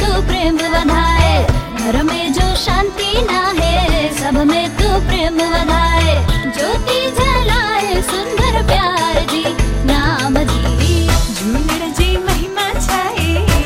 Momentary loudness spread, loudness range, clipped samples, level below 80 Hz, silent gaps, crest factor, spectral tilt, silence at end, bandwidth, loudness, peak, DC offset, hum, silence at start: 4 LU; 1 LU; under 0.1%; -18 dBFS; none; 14 dB; -4.5 dB/octave; 0 s; 16.5 kHz; -15 LUFS; 0 dBFS; under 0.1%; none; 0 s